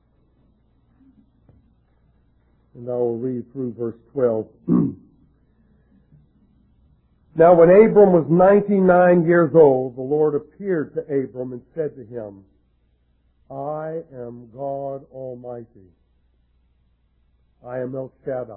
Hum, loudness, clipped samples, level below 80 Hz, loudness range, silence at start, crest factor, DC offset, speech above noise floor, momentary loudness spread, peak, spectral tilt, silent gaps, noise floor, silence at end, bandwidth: none; -18 LUFS; under 0.1%; -56 dBFS; 20 LU; 2.75 s; 20 dB; under 0.1%; 44 dB; 22 LU; -2 dBFS; -13 dB/octave; none; -63 dBFS; 0 s; 3.8 kHz